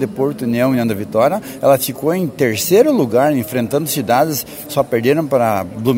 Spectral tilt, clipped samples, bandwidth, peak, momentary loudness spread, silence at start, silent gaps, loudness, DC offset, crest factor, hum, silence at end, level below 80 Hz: -5.5 dB/octave; under 0.1%; 16.5 kHz; 0 dBFS; 6 LU; 0 s; none; -16 LUFS; under 0.1%; 14 dB; none; 0 s; -54 dBFS